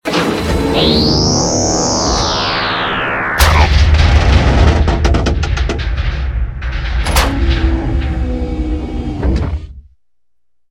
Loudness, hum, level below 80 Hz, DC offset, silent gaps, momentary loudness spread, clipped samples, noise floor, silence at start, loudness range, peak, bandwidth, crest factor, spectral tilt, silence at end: -14 LUFS; none; -16 dBFS; under 0.1%; none; 9 LU; under 0.1%; -77 dBFS; 0.05 s; 5 LU; 0 dBFS; 17 kHz; 12 dB; -4.5 dB/octave; 0.9 s